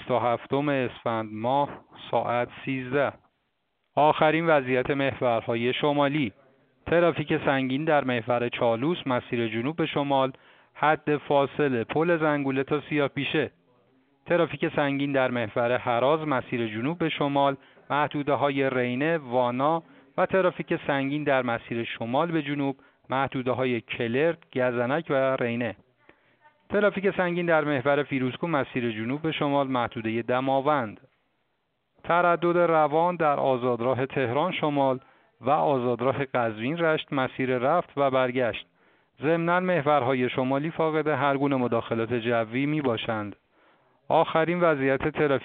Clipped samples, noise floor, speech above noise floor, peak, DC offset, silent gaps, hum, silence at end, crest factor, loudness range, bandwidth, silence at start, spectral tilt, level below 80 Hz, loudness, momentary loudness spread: under 0.1%; -76 dBFS; 51 dB; -6 dBFS; under 0.1%; none; none; 0 s; 20 dB; 3 LU; 4.6 kHz; 0 s; -4.5 dB/octave; -62 dBFS; -26 LUFS; 6 LU